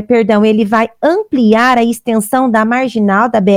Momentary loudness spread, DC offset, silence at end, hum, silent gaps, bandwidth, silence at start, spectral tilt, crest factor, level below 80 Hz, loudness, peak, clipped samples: 4 LU; under 0.1%; 0 s; none; none; 16.5 kHz; 0 s; -6 dB/octave; 10 dB; -50 dBFS; -11 LUFS; 0 dBFS; under 0.1%